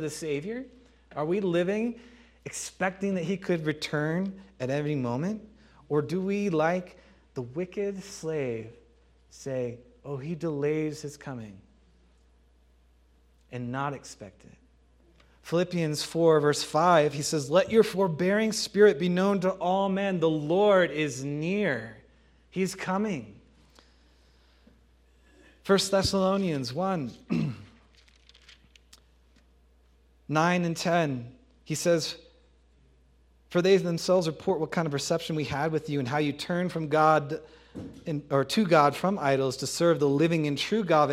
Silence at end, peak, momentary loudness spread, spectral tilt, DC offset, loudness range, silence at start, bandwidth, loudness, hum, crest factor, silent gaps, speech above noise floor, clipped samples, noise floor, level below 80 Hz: 0 s; -6 dBFS; 17 LU; -5.5 dB/octave; under 0.1%; 11 LU; 0 s; 15.5 kHz; -27 LUFS; none; 22 dB; none; 35 dB; under 0.1%; -62 dBFS; -60 dBFS